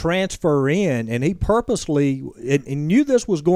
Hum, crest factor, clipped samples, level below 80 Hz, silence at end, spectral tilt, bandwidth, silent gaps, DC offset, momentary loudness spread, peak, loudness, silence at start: none; 14 dB; under 0.1%; -38 dBFS; 0 s; -6.5 dB/octave; 13.5 kHz; none; under 0.1%; 5 LU; -4 dBFS; -20 LUFS; 0 s